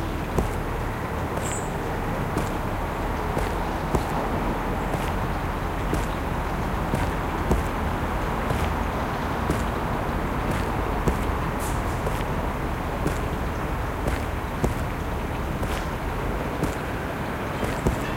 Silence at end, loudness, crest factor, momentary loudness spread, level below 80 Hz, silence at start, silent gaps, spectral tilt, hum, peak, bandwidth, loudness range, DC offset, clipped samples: 0 s; -27 LUFS; 18 dB; 3 LU; -32 dBFS; 0 s; none; -6 dB/octave; none; -8 dBFS; 17 kHz; 2 LU; under 0.1%; under 0.1%